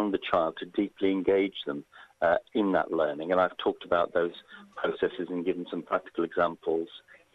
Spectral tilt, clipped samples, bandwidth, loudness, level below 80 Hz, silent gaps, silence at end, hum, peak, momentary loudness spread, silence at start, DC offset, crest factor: -7.5 dB/octave; under 0.1%; 6.6 kHz; -29 LUFS; -64 dBFS; none; 0.35 s; none; -8 dBFS; 8 LU; 0 s; under 0.1%; 20 dB